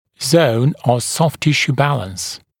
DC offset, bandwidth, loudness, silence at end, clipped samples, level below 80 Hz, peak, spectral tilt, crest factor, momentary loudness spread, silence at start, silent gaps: under 0.1%; 18 kHz; -16 LUFS; 0.25 s; under 0.1%; -54 dBFS; 0 dBFS; -5 dB/octave; 16 dB; 10 LU; 0.2 s; none